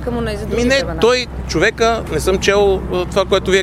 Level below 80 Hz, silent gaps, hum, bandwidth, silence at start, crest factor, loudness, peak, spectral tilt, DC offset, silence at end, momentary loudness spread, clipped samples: -28 dBFS; none; none; 15.5 kHz; 0 s; 16 dB; -16 LUFS; 0 dBFS; -4.5 dB/octave; under 0.1%; 0 s; 6 LU; under 0.1%